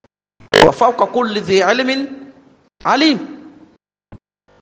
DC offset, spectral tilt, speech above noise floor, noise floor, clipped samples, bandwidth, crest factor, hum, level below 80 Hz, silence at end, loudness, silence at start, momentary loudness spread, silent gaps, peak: under 0.1%; -4 dB/octave; 36 dB; -50 dBFS; under 0.1%; 10 kHz; 16 dB; none; -50 dBFS; 0.45 s; -14 LUFS; 0.5 s; 14 LU; none; 0 dBFS